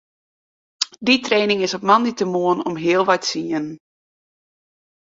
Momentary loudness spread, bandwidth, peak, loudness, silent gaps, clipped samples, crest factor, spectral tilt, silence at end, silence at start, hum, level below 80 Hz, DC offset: 9 LU; 8 kHz; -2 dBFS; -19 LUFS; none; under 0.1%; 20 dB; -4 dB/octave; 1.3 s; 0.8 s; none; -66 dBFS; under 0.1%